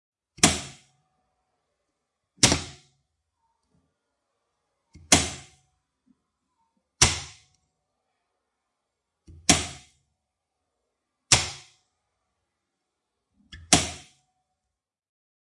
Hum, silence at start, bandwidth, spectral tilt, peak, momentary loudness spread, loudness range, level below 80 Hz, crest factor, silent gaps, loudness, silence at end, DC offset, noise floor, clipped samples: none; 0.4 s; 11.5 kHz; -2 dB/octave; 0 dBFS; 22 LU; 4 LU; -50 dBFS; 30 dB; none; -22 LUFS; 1.5 s; under 0.1%; -86 dBFS; under 0.1%